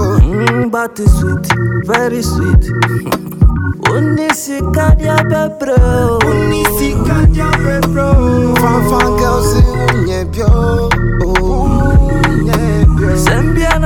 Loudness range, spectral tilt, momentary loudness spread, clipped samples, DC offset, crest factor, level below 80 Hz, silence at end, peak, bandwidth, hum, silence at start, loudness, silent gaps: 2 LU; -6 dB/octave; 4 LU; under 0.1%; under 0.1%; 10 dB; -16 dBFS; 0 s; 0 dBFS; 18 kHz; none; 0 s; -12 LUFS; none